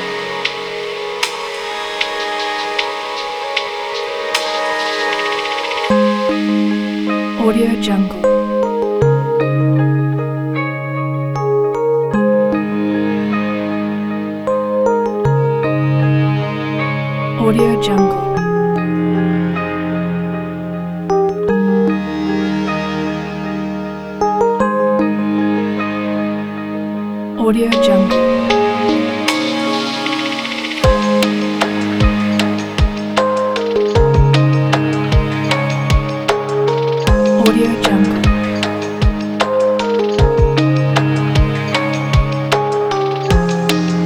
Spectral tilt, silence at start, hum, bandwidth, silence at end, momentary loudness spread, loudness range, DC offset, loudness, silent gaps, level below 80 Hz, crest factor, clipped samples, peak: -6.5 dB/octave; 0 s; none; 15 kHz; 0 s; 7 LU; 3 LU; under 0.1%; -16 LUFS; none; -28 dBFS; 16 dB; under 0.1%; 0 dBFS